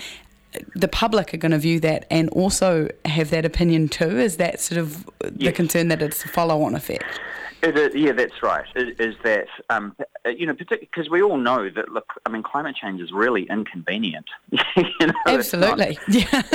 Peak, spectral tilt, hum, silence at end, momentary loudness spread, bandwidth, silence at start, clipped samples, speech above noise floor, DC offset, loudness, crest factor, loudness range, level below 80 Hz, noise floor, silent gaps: -2 dBFS; -5 dB/octave; none; 0 s; 10 LU; 17.5 kHz; 0 s; under 0.1%; 20 dB; under 0.1%; -21 LUFS; 20 dB; 4 LU; -42 dBFS; -41 dBFS; none